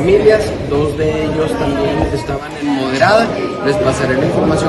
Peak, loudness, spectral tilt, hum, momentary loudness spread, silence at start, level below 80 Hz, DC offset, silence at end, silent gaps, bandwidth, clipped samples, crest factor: 0 dBFS; -14 LUFS; -6 dB/octave; none; 7 LU; 0 s; -32 dBFS; under 0.1%; 0 s; none; 12 kHz; under 0.1%; 14 dB